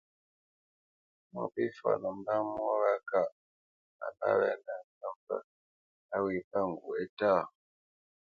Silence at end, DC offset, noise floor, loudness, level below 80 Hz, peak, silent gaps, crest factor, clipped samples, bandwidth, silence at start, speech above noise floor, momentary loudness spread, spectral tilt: 0.85 s; under 0.1%; under -90 dBFS; -33 LUFS; -74 dBFS; -14 dBFS; 3.32-3.99 s, 4.84-5.01 s, 5.16-5.27 s, 5.44-6.09 s, 6.44-6.51 s, 7.09-7.17 s; 20 dB; under 0.1%; 6.8 kHz; 1.35 s; over 58 dB; 14 LU; -8 dB/octave